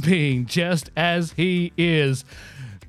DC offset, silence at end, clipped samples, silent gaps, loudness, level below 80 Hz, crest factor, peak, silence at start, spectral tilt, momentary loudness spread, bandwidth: under 0.1%; 0 s; under 0.1%; none; -21 LUFS; -52 dBFS; 16 dB; -6 dBFS; 0 s; -5.5 dB/octave; 16 LU; 13.5 kHz